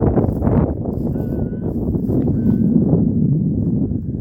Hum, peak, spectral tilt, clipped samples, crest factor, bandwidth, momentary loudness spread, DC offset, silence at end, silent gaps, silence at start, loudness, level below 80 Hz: none; 0 dBFS; -13 dB/octave; under 0.1%; 16 dB; 2.6 kHz; 7 LU; under 0.1%; 0 s; none; 0 s; -18 LUFS; -30 dBFS